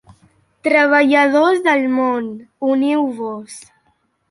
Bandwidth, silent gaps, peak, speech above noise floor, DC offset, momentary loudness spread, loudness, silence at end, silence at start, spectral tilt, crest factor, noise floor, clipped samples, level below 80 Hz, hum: 11.5 kHz; none; -2 dBFS; 47 dB; under 0.1%; 17 LU; -15 LUFS; 0.7 s; 0.65 s; -4 dB/octave; 16 dB; -63 dBFS; under 0.1%; -64 dBFS; none